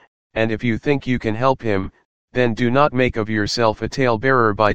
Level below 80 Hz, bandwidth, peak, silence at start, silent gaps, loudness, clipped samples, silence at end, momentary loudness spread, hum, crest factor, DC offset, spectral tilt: -42 dBFS; 9.4 kHz; 0 dBFS; 0 s; 0.07-0.30 s, 2.05-2.28 s; -19 LUFS; under 0.1%; 0 s; 7 LU; none; 18 dB; 2%; -6 dB/octave